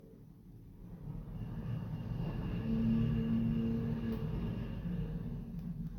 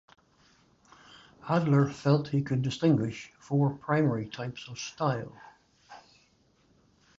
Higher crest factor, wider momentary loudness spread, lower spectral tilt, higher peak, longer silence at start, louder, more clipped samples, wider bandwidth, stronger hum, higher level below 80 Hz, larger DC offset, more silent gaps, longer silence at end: about the same, 16 dB vs 20 dB; first, 20 LU vs 13 LU; first, -10 dB/octave vs -7 dB/octave; second, -22 dBFS vs -10 dBFS; second, 0 s vs 1.45 s; second, -38 LUFS vs -29 LUFS; neither; first, 13.5 kHz vs 7.8 kHz; neither; first, -46 dBFS vs -64 dBFS; neither; neither; second, 0 s vs 1.2 s